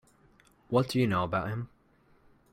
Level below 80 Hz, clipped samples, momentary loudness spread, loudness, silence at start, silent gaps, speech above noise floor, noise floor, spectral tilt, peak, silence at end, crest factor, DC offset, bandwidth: -62 dBFS; under 0.1%; 11 LU; -30 LUFS; 0.7 s; none; 36 dB; -64 dBFS; -7 dB/octave; -12 dBFS; 0.85 s; 20 dB; under 0.1%; 15.5 kHz